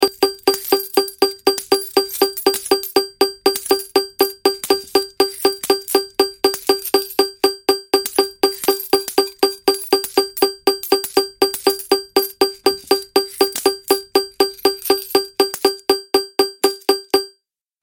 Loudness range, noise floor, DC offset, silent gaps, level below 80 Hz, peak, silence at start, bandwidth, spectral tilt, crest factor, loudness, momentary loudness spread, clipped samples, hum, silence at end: 0 LU; -66 dBFS; under 0.1%; none; -56 dBFS; 0 dBFS; 0 s; 17 kHz; -1 dB/octave; 18 dB; -18 LUFS; 3 LU; under 0.1%; none; 0.55 s